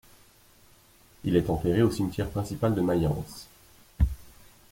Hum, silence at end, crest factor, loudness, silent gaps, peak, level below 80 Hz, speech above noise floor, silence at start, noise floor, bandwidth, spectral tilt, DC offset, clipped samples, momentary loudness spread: none; 0.45 s; 20 dB; -27 LUFS; none; -10 dBFS; -40 dBFS; 31 dB; 1.25 s; -58 dBFS; 16.5 kHz; -7.5 dB/octave; under 0.1%; under 0.1%; 12 LU